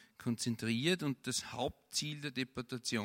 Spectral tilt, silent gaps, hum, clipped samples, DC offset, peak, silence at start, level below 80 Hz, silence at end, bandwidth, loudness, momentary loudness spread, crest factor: -4 dB/octave; none; none; under 0.1%; under 0.1%; -18 dBFS; 0 s; -68 dBFS; 0 s; 16.5 kHz; -37 LUFS; 7 LU; 20 dB